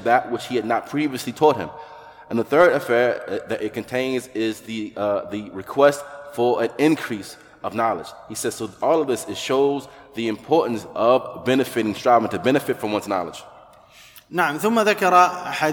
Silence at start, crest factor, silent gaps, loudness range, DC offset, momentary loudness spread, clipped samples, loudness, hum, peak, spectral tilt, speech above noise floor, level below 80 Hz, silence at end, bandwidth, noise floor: 0 s; 20 dB; none; 3 LU; under 0.1%; 13 LU; under 0.1%; -21 LUFS; none; -2 dBFS; -4.5 dB/octave; 28 dB; -62 dBFS; 0 s; 19 kHz; -48 dBFS